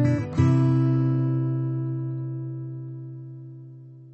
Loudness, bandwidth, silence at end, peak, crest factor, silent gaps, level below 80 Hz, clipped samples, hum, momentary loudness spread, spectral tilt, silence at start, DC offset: -24 LUFS; 6.6 kHz; 0 s; -8 dBFS; 16 dB; none; -54 dBFS; under 0.1%; none; 21 LU; -9.5 dB/octave; 0 s; under 0.1%